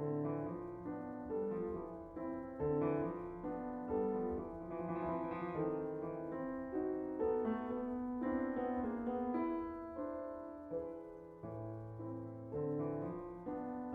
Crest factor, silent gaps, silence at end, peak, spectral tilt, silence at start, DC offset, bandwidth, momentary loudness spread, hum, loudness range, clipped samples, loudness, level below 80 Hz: 16 dB; none; 0 s; -26 dBFS; -10.5 dB/octave; 0 s; under 0.1%; 4.2 kHz; 9 LU; none; 5 LU; under 0.1%; -42 LUFS; -64 dBFS